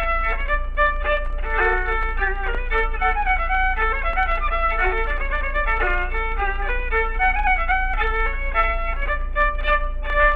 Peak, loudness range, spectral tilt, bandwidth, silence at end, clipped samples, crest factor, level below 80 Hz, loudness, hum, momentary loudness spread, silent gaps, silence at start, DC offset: -6 dBFS; 1 LU; -7 dB/octave; 4.3 kHz; 0 s; under 0.1%; 14 dB; -24 dBFS; -22 LUFS; none; 5 LU; none; 0 s; under 0.1%